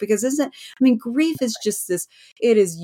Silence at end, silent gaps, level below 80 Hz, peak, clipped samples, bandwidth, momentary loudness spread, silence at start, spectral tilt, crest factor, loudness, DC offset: 0 s; none; -68 dBFS; -6 dBFS; under 0.1%; 17 kHz; 9 LU; 0 s; -4 dB/octave; 14 dB; -21 LUFS; under 0.1%